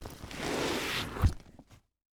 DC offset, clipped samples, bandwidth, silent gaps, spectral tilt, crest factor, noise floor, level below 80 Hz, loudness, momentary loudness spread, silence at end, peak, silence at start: under 0.1%; under 0.1%; over 20 kHz; none; -4.5 dB/octave; 20 dB; -58 dBFS; -42 dBFS; -33 LUFS; 11 LU; 0.35 s; -14 dBFS; 0 s